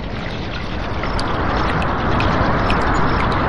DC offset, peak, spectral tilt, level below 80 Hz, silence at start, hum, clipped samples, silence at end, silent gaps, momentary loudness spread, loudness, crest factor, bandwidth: 3%; -4 dBFS; -6.5 dB/octave; -26 dBFS; 0 s; none; under 0.1%; 0 s; none; 8 LU; -19 LUFS; 14 dB; 11.5 kHz